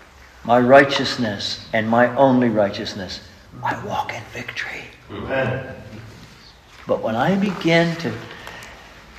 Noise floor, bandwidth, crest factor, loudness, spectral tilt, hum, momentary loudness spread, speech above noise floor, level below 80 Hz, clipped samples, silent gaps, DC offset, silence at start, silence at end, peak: -45 dBFS; 14 kHz; 20 dB; -19 LUFS; -5.5 dB/octave; none; 20 LU; 26 dB; -50 dBFS; under 0.1%; none; under 0.1%; 0.2 s; 0 s; 0 dBFS